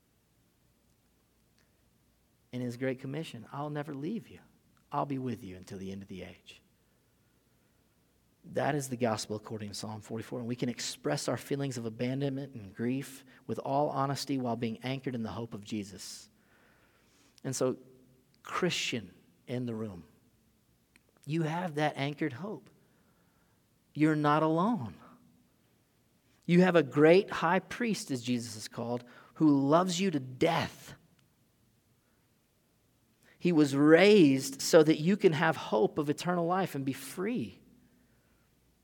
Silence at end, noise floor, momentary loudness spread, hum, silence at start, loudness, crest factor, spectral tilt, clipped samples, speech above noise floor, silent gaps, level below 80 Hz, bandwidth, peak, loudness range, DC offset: 1.3 s; -71 dBFS; 19 LU; none; 2.55 s; -30 LUFS; 24 dB; -5.5 dB/octave; under 0.1%; 41 dB; none; -72 dBFS; 18.5 kHz; -8 dBFS; 14 LU; under 0.1%